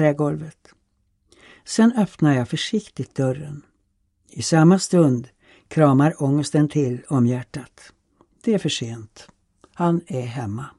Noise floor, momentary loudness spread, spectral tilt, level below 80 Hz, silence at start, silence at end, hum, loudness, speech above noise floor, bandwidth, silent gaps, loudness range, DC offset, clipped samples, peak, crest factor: -68 dBFS; 16 LU; -6.5 dB/octave; -60 dBFS; 0 s; 0.1 s; none; -21 LUFS; 48 dB; 11.5 kHz; none; 6 LU; under 0.1%; under 0.1%; -2 dBFS; 20 dB